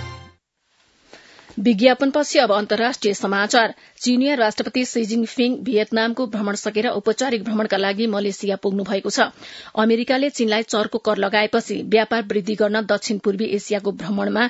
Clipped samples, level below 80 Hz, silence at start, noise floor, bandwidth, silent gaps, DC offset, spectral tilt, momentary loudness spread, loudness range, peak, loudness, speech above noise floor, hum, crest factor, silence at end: under 0.1%; -66 dBFS; 0 s; -64 dBFS; 8 kHz; none; under 0.1%; -4 dB/octave; 6 LU; 3 LU; 0 dBFS; -20 LUFS; 44 dB; none; 20 dB; 0 s